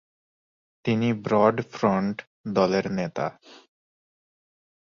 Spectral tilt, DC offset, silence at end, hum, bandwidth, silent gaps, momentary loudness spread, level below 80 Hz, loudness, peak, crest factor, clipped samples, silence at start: -7 dB/octave; under 0.1%; 1.3 s; none; 7.2 kHz; 2.27-2.44 s; 11 LU; -62 dBFS; -25 LUFS; -6 dBFS; 22 dB; under 0.1%; 0.85 s